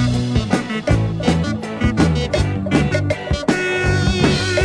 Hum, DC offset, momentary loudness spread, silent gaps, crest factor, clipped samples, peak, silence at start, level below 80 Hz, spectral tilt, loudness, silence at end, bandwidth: none; under 0.1%; 4 LU; none; 16 dB; under 0.1%; -2 dBFS; 0 s; -28 dBFS; -6 dB/octave; -18 LUFS; 0 s; 10.5 kHz